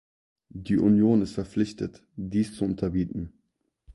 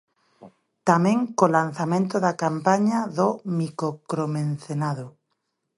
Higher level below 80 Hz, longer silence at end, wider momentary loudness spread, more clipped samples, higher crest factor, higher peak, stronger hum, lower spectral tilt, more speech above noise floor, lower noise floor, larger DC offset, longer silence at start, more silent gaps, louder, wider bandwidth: first, -50 dBFS vs -70 dBFS; about the same, 0.65 s vs 0.7 s; first, 18 LU vs 8 LU; neither; second, 16 dB vs 22 dB; second, -10 dBFS vs -2 dBFS; neither; first, -8 dB/octave vs -6.5 dB/octave; second, 50 dB vs 54 dB; about the same, -75 dBFS vs -76 dBFS; neither; first, 0.55 s vs 0.4 s; neither; second, -26 LUFS vs -23 LUFS; about the same, 11.5 kHz vs 11.5 kHz